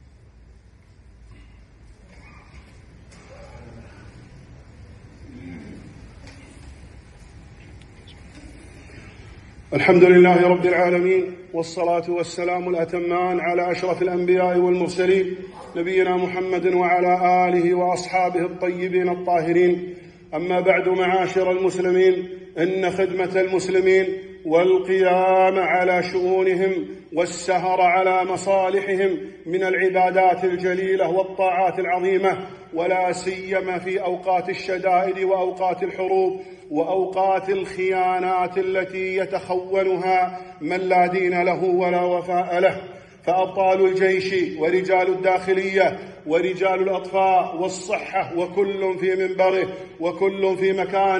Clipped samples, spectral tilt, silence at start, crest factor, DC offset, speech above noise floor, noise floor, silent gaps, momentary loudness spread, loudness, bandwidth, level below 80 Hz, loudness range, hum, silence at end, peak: under 0.1%; -6 dB/octave; 1.3 s; 20 dB; under 0.1%; 30 dB; -49 dBFS; none; 9 LU; -20 LUFS; 9.8 kHz; -54 dBFS; 4 LU; none; 0 s; 0 dBFS